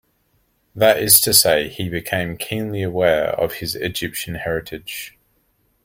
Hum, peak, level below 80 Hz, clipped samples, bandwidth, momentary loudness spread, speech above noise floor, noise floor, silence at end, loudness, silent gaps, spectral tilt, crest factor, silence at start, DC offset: none; 0 dBFS; -48 dBFS; under 0.1%; 16.5 kHz; 17 LU; 45 dB; -64 dBFS; 0.75 s; -17 LUFS; none; -2.5 dB/octave; 20 dB; 0.75 s; under 0.1%